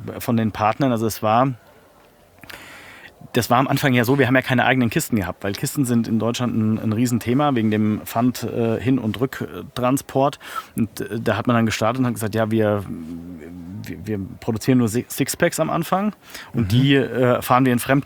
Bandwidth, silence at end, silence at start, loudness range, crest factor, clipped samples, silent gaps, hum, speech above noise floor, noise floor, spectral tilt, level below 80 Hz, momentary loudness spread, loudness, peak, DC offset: over 20 kHz; 0 s; 0 s; 4 LU; 20 dB; under 0.1%; none; none; 32 dB; -52 dBFS; -6 dB/octave; -54 dBFS; 15 LU; -20 LUFS; -2 dBFS; under 0.1%